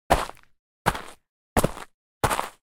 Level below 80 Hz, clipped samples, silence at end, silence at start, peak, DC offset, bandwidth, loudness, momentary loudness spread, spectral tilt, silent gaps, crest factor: -40 dBFS; under 0.1%; 0.25 s; 0.1 s; -4 dBFS; under 0.1%; 18 kHz; -27 LUFS; 18 LU; -4 dB/octave; 0.59-0.85 s, 1.29-1.56 s, 1.94-2.21 s; 24 dB